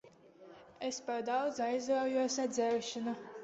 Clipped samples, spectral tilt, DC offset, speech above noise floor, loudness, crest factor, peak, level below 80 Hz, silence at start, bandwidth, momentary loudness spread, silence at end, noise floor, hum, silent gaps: under 0.1%; -2.5 dB/octave; under 0.1%; 23 dB; -35 LUFS; 14 dB; -22 dBFS; -80 dBFS; 0.05 s; 8 kHz; 7 LU; 0 s; -58 dBFS; none; none